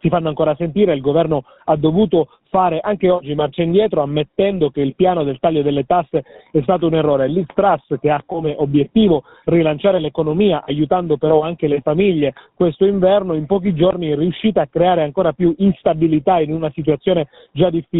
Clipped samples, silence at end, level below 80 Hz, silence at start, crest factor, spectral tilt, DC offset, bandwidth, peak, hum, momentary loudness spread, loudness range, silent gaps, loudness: under 0.1%; 0 s; -46 dBFS; 0.05 s; 16 dB; -6.5 dB/octave; under 0.1%; 4.1 kHz; 0 dBFS; none; 5 LU; 1 LU; none; -17 LUFS